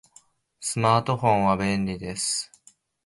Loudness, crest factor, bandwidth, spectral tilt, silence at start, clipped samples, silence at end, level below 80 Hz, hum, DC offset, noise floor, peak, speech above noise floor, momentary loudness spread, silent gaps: -24 LUFS; 20 dB; 11.5 kHz; -4.5 dB/octave; 0.6 s; under 0.1%; 0.6 s; -52 dBFS; none; under 0.1%; -59 dBFS; -6 dBFS; 35 dB; 9 LU; none